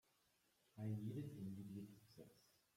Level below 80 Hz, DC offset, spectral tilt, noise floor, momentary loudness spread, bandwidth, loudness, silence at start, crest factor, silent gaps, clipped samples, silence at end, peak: -84 dBFS; under 0.1%; -8 dB/octave; -81 dBFS; 17 LU; 16.5 kHz; -52 LUFS; 0.75 s; 16 dB; none; under 0.1%; 0.35 s; -38 dBFS